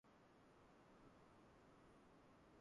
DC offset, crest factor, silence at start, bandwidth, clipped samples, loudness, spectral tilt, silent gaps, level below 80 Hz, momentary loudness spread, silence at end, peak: under 0.1%; 14 dB; 0.05 s; 10.5 kHz; under 0.1%; -70 LUFS; -5.5 dB/octave; none; -82 dBFS; 1 LU; 0 s; -56 dBFS